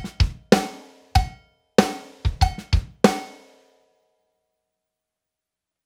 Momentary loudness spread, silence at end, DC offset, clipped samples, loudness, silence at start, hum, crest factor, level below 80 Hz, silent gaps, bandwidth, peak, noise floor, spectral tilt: 12 LU; 2.55 s; under 0.1%; under 0.1%; -23 LUFS; 0 s; none; 24 dB; -32 dBFS; none; 17 kHz; 0 dBFS; -85 dBFS; -5.5 dB/octave